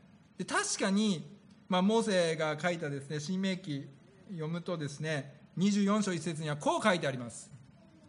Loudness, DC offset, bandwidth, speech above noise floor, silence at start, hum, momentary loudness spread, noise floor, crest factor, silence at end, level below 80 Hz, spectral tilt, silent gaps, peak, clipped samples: -32 LUFS; under 0.1%; 10.5 kHz; 26 dB; 0.4 s; none; 15 LU; -58 dBFS; 20 dB; 0.5 s; -76 dBFS; -5 dB/octave; none; -12 dBFS; under 0.1%